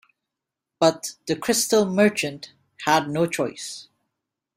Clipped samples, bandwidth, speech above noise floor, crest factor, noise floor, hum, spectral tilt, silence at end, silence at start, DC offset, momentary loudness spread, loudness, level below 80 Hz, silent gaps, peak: under 0.1%; 16 kHz; 63 dB; 20 dB; -85 dBFS; none; -3.5 dB/octave; 0.75 s; 0.8 s; under 0.1%; 15 LU; -22 LUFS; -64 dBFS; none; -4 dBFS